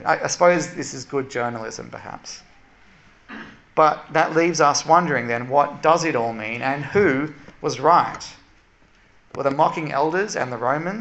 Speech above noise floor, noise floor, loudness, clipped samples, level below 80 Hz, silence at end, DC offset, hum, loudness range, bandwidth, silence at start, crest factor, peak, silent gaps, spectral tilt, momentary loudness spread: 34 dB; -55 dBFS; -20 LUFS; under 0.1%; -58 dBFS; 0 s; under 0.1%; none; 6 LU; 8.4 kHz; 0 s; 20 dB; -2 dBFS; none; -4.5 dB/octave; 18 LU